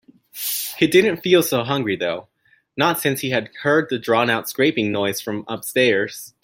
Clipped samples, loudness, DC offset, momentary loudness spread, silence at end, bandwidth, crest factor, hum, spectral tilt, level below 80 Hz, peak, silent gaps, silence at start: under 0.1%; -20 LUFS; under 0.1%; 11 LU; 0.15 s; 17 kHz; 18 dB; none; -4 dB/octave; -62 dBFS; -2 dBFS; none; 0.35 s